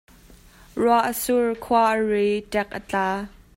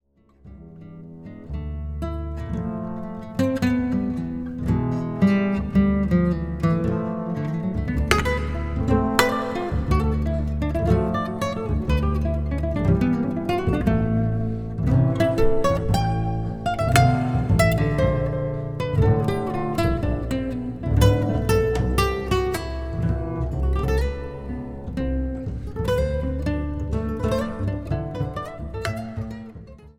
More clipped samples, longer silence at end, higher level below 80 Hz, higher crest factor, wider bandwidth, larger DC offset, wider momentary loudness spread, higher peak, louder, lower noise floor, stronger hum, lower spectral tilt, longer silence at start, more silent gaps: neither; first, 0.3 s vs 0.05 s; second, -52 dBFS vs -30 dBFS; second, 16 dB vs 22 dB; second, 16 kHz vs 20 kHz; second, under 0.1% vs 0.3%; second, 7 LU vs 11 LU; second, -6 dBFS vs 0 dBFS; about the same, -22 LUFS vs -23 LUFS; about the same, -50 dBFS vs -50 dBFS; neither; second, -4.5 dB/octave vs -7 dB/octave; first, 0.75 s vs 0.45 s; neither